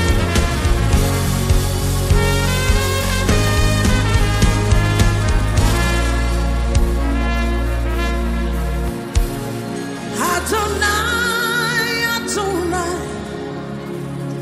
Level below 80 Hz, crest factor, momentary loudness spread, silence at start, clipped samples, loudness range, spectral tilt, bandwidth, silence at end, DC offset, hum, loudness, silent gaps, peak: -20 dBFS; 14 dB; 9 LU; 0 s; under 0.1%; 4 LU; -4.5 dB/octave; 16 kHz; 0 s; under 0.1%; none; -18 LUFS; none; -2 dBFS